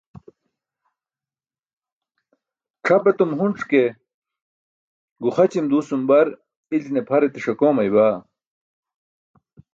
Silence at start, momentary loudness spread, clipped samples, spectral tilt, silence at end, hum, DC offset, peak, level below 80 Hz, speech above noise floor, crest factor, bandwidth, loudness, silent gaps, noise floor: 2.85 s; 9 LU; under 0.1%; -7.5 dB/octave; 1.55 s; none; under 0.1%; -4 dBFS; -68 dBFS; over 72 dB; 18 dB; 7.6 kHz; -19 LUFS; 4.14-4.22 s, 4.42-5.16 s, 6.57-6.64 s; under -90 dBFS